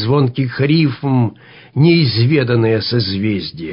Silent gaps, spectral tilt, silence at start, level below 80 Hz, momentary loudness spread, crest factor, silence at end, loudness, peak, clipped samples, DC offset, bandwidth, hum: none; -11.5 dB/octave; 0 s; -44 dBFS; 7 LU; 12 dB; 0 s; -15 LUFS; -2 dBFS; under 0.1%; under 0.1%; 5.4 kHz; none